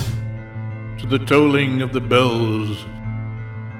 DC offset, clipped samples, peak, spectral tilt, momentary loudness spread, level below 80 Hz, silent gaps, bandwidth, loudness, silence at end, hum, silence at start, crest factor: under 0.1%; under 0.1%; -2 dBFS; -6.5 dB/octave; 15 LU; -42 dBFS; none; 15.5 kHz; -20 LUFS; 0 s; none; 0 s; 18 dB